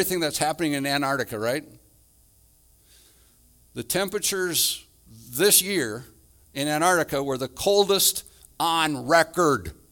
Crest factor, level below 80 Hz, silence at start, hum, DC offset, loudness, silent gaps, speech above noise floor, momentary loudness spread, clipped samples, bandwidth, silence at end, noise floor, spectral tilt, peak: 22 dB; -56 dBFS; 0 s; none; under 0.1%; -23 LUFS; none; 35 dB; 13 LU; under 0.1%; 19.5 kHz; 0.2 s; -58 dBFS; -2.5 dB/octave; -4 dBFS